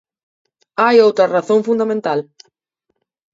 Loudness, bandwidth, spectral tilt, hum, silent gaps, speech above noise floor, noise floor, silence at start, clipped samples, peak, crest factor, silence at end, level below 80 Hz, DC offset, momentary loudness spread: -15 LUFS; 7.8 kHz; -5.5 dB/octave; none; none; 58 dB; -72 dBFS; 0.8 s; under 0.1%; 0 dBFS; 16 dB; 1.1 s; -70 dBFS; under 0.1%; 11 LU